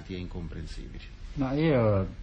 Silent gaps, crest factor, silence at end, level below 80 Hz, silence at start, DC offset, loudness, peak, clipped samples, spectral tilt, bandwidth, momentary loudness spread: none; 16 dB; 0 s; -42 dBFS; 0 s; under 0.1%; -28 LUFS; -14 dBFS; under 0.1%; -8.5 dB/octave; 8.8 kHz; 19 LU